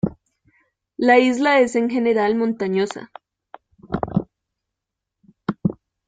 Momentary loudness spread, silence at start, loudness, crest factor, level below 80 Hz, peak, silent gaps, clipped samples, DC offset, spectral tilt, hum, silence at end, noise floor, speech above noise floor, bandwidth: 15 LU; 0.05 s; -20 LUFS; 20 dB; -52 dBFS; -2 dBFS; none; under 0.1%; under 0.1%; -6 dB/octave; none; 0.35 s; -83 dBFS; 65 dB; 9.2 kHz